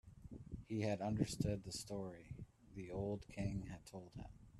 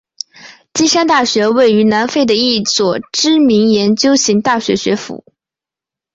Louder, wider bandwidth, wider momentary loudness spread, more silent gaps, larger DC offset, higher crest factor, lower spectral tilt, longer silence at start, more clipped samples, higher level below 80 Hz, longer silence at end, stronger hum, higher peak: second, -45 LUFS vs -12 LUFS; first, 13 kHz vs 8 kHz; first, 16 LU vs 11 LU; neither; neither; first, 22 dB vs 12 dB; first, -6 dB/octave vs -3.5 dB/octave; second, 0.05 s vs 0.45 s; neither; second, -60 dBFS vs -52 dBFS; second, 0 s vs 1 s; neither; second, -22 dBFS vs -2 dBFS